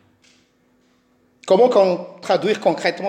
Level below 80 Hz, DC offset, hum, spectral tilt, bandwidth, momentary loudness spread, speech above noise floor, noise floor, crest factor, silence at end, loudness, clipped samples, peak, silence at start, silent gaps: -70 dBFS; under 0.1%; none; -5.5 dB/octave; 9.8 kHz; 10 LU; 43 dB; -60 dBFS; 16 dB; 0 s; -17 LUFS; under 0.1%; -4 dBFS; 1.45 s; none